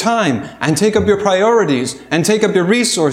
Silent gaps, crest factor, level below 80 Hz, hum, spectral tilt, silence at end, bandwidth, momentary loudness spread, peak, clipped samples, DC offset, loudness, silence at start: none; 14 dB; -46 dBFS; none; -4.5 dB/octave; 0 s; 15.5 kHz; 6 LU; 0 dBFS; under 0.1%; under 0.1%; -14 LUFS; 0 s